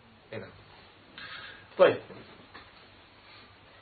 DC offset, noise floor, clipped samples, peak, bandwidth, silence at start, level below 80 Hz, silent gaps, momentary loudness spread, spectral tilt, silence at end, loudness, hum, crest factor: under 0.1%; -55 dBFS; under 0.1%; -8 dBFS; 4.6 kHz; 0.3 s; -68 dBFS; none; 28 LU; -3 dB/octave; 1.7 s; -28 LUFS; none; 26 dB